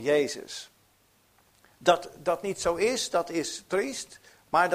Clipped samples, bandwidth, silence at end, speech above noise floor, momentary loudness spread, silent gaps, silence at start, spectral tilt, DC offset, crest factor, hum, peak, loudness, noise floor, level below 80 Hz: under 0.1%; 15.5 kHz; 0 s; 37 dB; 14 LU; none; 0 s; -3 dB/octave; under 0.1%; 22 dB; none; -8 dBFS; -28 LUFS; -65 dBFS; -62 dBFS